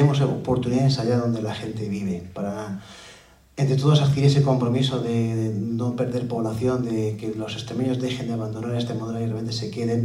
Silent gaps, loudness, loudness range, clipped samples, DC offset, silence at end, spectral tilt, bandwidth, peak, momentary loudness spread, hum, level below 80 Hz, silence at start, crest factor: none; -24 LUFS; 5 LU; under 0.1%; under 0.1%; 0 s; -7 dB/octave; 11.5 kHz; -6 dBFS; 11 LU; none; -54 dBFS; 0 s; 18 dB